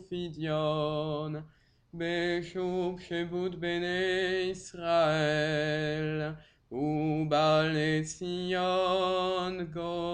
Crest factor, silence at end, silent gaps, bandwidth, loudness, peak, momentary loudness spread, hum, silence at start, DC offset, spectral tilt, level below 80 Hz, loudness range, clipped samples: 14 dB; 0 s; none; 10 kHz; -31 LUFS; -16 dBFS; 10 LU; none; 0 s; under 0.1%; -5.5 dB/octave; -60 dBFS; 4 LU; under 0.1%